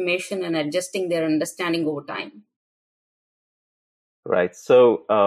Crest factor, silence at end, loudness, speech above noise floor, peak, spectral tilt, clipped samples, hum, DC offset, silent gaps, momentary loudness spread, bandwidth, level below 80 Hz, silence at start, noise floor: 16 dB; 0 s; -21 LUFS; over 69 dB; -6 dBFS; -4.5 dB/octave; under 0.1%; none; under 0.1%; 2.56-4.23 s; 14 LU; 14 kHz; -74 dBFS; 0 s; under -90 dBFS